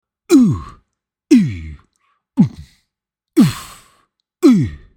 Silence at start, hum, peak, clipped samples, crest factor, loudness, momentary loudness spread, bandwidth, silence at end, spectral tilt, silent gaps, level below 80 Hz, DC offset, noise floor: 0.3 s; none; 0 dBFS; under 0.1%; 16 dB; -15 LUFS; 15 LU; 17.5 kHz; 0.2 s; -7 dB/octave; none; -42 dBFS; under 0.1%; -81 dBFS